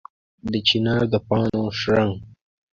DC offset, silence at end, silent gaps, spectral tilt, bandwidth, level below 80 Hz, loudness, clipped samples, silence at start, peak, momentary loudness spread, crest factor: under 0.1%; 0.45 s; none; -6.5 dB/octave; 7.4 kHz; -48 dBFS; -21 LUFS; under 0.1%; 0.45 s; -6 dBFS; 9 LU; 18 dB